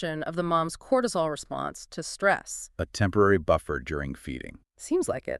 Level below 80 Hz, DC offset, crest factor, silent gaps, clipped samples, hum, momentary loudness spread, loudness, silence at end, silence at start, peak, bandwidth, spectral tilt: -48 dBFS; under 0.1%; 18 dB; none; under 0.1%; none; 14 LU; -27 LUFS; 0 s; 0 s; -10 dBFS; 13.5 kHz; -5 dB/octave